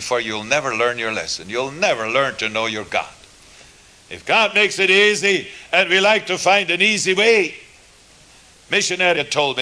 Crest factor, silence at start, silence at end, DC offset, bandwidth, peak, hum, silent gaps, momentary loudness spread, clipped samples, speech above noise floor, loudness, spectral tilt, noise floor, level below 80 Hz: 16 dB; 0 s; 0 s; under 0.1%; 11 kHz; -2 dBFS; none; none; 10 LU; under 0.1%; 30 dB; -17 LUFS; -2 dB/octave; -48 dBFS; -58 dBFS